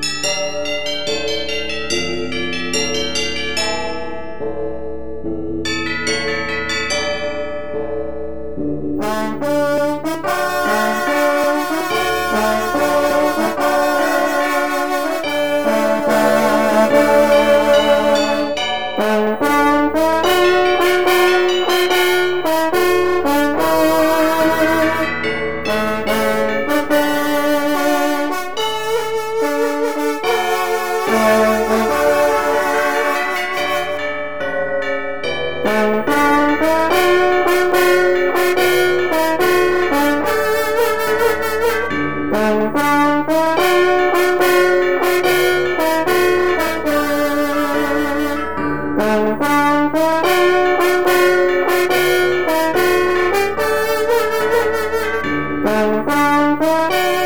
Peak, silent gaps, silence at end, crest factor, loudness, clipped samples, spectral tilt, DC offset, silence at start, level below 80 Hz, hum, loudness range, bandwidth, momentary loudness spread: 0 dBFS; none; 0 s; 14 dB; -16 LUFS; under 0.1%; -3.5 dB/octave; 3%; 0 s; -44 dBFS; none; 6 LU; over 20 kHz; 8 LU